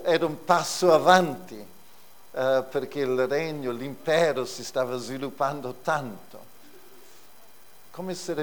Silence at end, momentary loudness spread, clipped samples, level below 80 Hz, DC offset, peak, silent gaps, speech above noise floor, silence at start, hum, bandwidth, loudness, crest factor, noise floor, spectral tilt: 0 s; 18 LU; under 0.1%; -70 dBFS; 0.5%; -2 dBFS; none; 29 dB; 0 s; none; over 20 kHz; -25 LUFS; 24 dB; -54 dBFS; -4.5 dB/octave